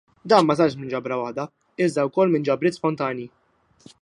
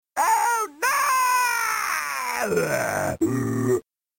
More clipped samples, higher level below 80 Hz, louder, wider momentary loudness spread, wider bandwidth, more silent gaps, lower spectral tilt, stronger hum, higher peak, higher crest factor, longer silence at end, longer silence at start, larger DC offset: neither; second, -66 dBFS vs -58 dBFS; about the same, -22 LUFS vs -23 LUFS; first, 14 LU vs 5 LU; second, 11.5 kHz vs 17 kHz; neither; first, -6.5 dB/octave vs -3.5 dB/octave; neither; first, -2 dBFS vs -10 dBFS; first, 20 dB vs 12 dB; first, 0.75 s vs 0.4 s; about the same, 0.25 s vs 0.15 s; neither